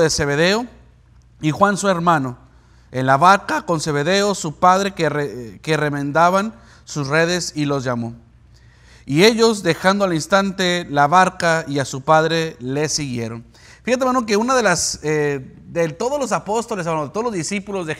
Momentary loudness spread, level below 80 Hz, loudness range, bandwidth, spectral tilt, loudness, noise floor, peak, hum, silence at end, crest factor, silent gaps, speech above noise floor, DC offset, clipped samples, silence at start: 11 LU; -50 dBFS; 3 LU; 16 kHz; -4.5 dB/octave; -18 LUFS; -49 dBFS; 0 dBFS; none; 0 s; 18 dB; none; 31 dB; under 0.1%; under 0.1%; 0 s